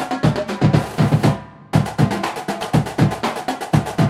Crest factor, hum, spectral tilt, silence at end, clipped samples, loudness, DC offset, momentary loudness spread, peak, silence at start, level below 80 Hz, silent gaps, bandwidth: 16 dB; none; -6.5 dB/octave; 0 s; under 0.1%; -19 LUFS; under 0.1%; 7 LU; -2 dBFS; 0 s; -40 dBFS; none; 15 kHz